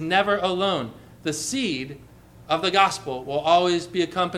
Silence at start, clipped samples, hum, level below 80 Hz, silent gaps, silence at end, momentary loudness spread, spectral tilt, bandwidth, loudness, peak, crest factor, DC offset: 0 s; under 0.1%; none; -56 dBFS; none; 0 s; 11 LU; -3.5 dB/octave; 15 kHz; -23 LUFS; -2 dBFS; 22 dB; under 0.1%